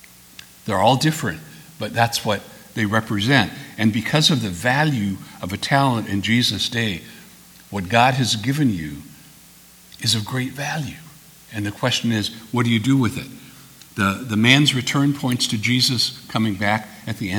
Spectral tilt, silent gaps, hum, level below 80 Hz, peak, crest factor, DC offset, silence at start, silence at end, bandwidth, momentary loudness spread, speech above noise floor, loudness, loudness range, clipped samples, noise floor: -4.5 dB/octave; none; none; -54 dBFS; 0 dBFS; 22 dB; under 0.1%; 0.65 s; 0 s; over 20 kHz; 15 LU; 27 dB; -20 LUFS; 5 LU; under 0.1%; -47 dBFS